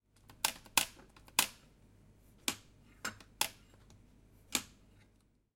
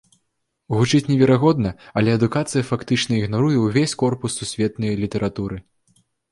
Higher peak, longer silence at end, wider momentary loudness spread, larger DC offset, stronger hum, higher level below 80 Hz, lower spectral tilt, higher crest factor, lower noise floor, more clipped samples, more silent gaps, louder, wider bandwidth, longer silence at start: second, -10 dBFS vs -4 dBFS; first, 0.9 s vs 0.7 s; first, 12 LU vs 9 LU; neither; neither; second, -66 dBFS vs -48 dBFS; second, 0 dB/octave vs -6 dB/octave; first, 32 dB vs 16 dB; second, -70 dBFS vs -74 dBFS; neither; neither; second, -36 LUFS vs -20 LUFS; first, 16.5 kHz vs 11.5 kHz; second, 0.3 s vs 0.7 s